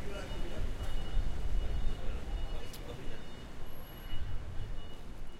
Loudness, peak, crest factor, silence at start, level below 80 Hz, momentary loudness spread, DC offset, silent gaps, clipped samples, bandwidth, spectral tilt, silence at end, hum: -43 LUFS; -18 dBFS; 14 dB; 0 s; -36 dBFS; 9 LU; under 0.1%; none; under 0.1%; 12 kHz; -5.5 dB/octave; 0 s; none